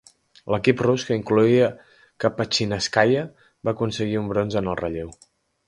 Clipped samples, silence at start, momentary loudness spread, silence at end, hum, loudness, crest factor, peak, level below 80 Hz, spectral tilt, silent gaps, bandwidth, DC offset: under 0.1%; 0.45 s; 11 LU; 0.55 s; none; -22 LUFS; 22 dB; -2 dBFS; -50 dBFS; -5.5 dB/octave; none; 11.5 kHz; under 0.1%